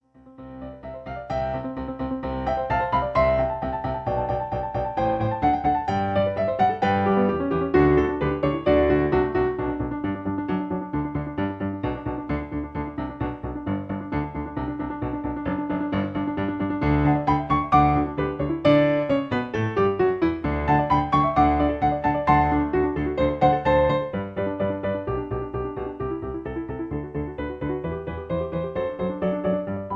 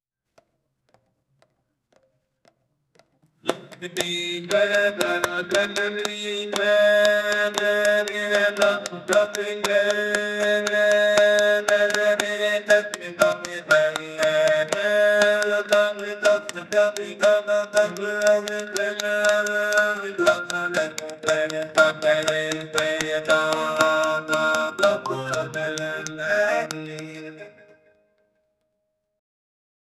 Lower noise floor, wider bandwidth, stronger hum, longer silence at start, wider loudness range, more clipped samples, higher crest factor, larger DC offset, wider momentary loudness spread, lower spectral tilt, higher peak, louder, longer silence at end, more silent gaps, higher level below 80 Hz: second, -45 dBFS vs -76 dBFS; second, 6.4 kHz vs 14 kHz; neither; second, 0.25 s vs 3.45 s; about the same, 8 LU vs 8 LU; neither; about the same, 20 dB vs 22 dB; neither; about the same, 11 LU vs 9 LU; first, -9 dB/octave vs -2.5 dB/octave; second, -4 dBFS vs 0 dBFS; second, -24 LUFS vs -21 LUFS; second, 0 s vs 2.5 s; neither; first, -38 dBFS vs -68 dBFS